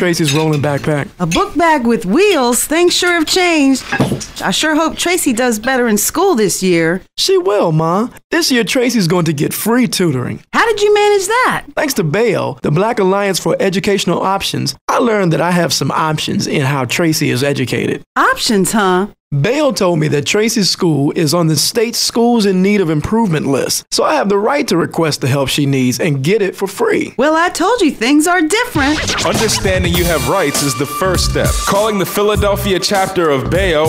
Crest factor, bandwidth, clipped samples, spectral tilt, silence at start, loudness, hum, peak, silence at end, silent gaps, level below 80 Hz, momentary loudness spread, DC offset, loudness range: 12 dB; 16 kHz; under 0.1%; -4.5 dB/octave; 0 s; -13 LUFS; none; 0 dBFS; 0 s; 8.24-8.30 s, 14.81-14.88 s, 18.06-18.16 s, 19.20-19.31 s; -34 dBFS; 4 LU; under 0.1%; 2 LU